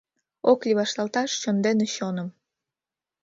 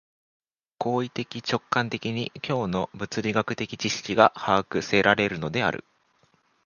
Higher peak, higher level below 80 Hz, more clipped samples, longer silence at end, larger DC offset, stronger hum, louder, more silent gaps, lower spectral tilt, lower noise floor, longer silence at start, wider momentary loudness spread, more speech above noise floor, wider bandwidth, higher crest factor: second, -6 dBFS vs 0 dBFS; second, -72 dBFS vs -58 dBFS; neither; about the same, 0.9 s vs 0.85 s; neither; neither; about the same, -24 LUFS vs -25 LUFS; neither; about the same, -4.5 dB/octave vs -4.5 dB/octave; first, under -90 dBFS vs -65 dBFS; second, 0.45 s vs 0.8 s; about the same, 9 LU vs 10 LU; first, over 66 dB vs 40 dB; second, 7.8 kHz vs 10 kHz; second, 20 dB vs 26 dB